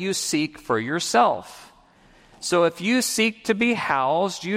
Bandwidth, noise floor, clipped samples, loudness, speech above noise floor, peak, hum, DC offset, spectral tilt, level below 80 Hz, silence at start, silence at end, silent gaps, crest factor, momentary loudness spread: 16 kHz; -54 dBFS; under 0.1%; -22 LUFS; 32 dB; -6 dBFS; none; under 0.1%; -3.5 dB/octave; -62 dBFS; 0 s; 0 s; none; 18 dB; 6 LU